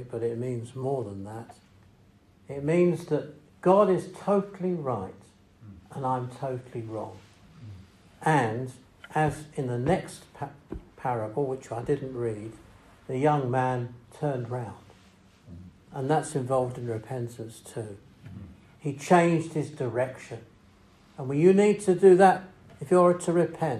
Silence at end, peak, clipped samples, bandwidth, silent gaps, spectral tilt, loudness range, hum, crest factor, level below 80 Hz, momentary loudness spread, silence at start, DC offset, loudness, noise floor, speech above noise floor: 0 s; -6 dBFS; under 0.1%; 12.5 kHz; none; -7 dB/octave; 9 LU; none; 22 dB; -60 dBFS; 21 LU; 0 s; under 0.1%; -27 LUFS; -58 dBFS; 32 dB